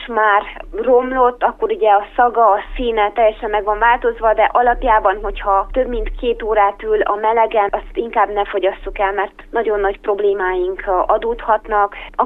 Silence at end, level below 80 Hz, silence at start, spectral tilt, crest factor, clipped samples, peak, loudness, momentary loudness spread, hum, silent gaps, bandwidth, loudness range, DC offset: 0 s; -34 dBFS; 0 s; -7 dB/octave; 16 dB; under 0.1%; 0 dBFS; -16 LUFS; 7 LU; none; none; 4 kHz; 3 LU; under 0.1%